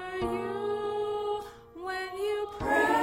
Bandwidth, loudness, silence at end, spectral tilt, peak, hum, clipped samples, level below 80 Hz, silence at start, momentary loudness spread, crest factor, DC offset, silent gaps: 16 kHz; -32 LUFS; 0 s; -5 dB/octave; -14 dBFS; none; under 0.1%; -54 dBFS; 0 s; 10 LU; 18 dB; under 0.1%; none